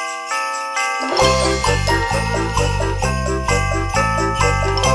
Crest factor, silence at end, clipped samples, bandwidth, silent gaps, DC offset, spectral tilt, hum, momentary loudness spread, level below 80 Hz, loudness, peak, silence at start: 16 dB; 0 s; under 0.1%; 11 kHz; none; under 0.1%; -4 dB/octave; none; 5 LU; -26 dBFS; -18 LUFS; -2 dBFS; 0 s